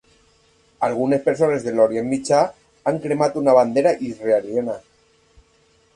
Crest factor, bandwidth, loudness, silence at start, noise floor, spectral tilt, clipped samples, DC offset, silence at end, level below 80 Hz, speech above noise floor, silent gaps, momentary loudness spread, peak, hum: 18 dB; 11 kHz; -20 LUFS; 0.8 s; -59 dBFS; -6 dB/octave; under 0.1%; under 0.1%; 1.15 s; -60 dBFS; 40 dB; none; 9 LU; -2 dBFS; none